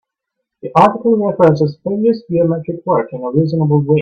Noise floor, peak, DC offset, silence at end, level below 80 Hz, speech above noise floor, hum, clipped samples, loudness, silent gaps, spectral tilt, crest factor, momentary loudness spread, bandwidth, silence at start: -76 dBFS; 0 dBFS; under 0.1%; 0 s; -54 dBFS; 63 dB; none; under 0.1%; -14 LUFS; none; -9.5 dB/octave; 14 dB; 6 LU; 6.6 kHz; 0.65 s